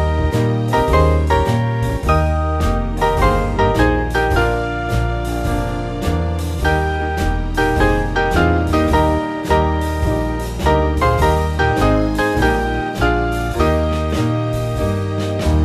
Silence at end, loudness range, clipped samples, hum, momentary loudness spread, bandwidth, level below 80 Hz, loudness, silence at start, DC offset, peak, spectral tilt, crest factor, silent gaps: 0 s; 2 LU; under 0.1%; none; 5 LU; 14 kHz; -22 dBFS; -17 LUFS; 0 s; under 0.1%; 0 dBFS; -6.5 dB/octave; 16 dB; none